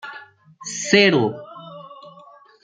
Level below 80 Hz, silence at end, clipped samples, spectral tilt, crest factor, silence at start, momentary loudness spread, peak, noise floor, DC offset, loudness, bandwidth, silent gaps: -66 dBFS; 0.55 s; under 0.1%; -3.5 dB/octave; 20 dB; 0.05 s; 26 LU; -2 dBFS; -48 dBFS; under 0.1%; -18 LUFS; 9.4 kHz; none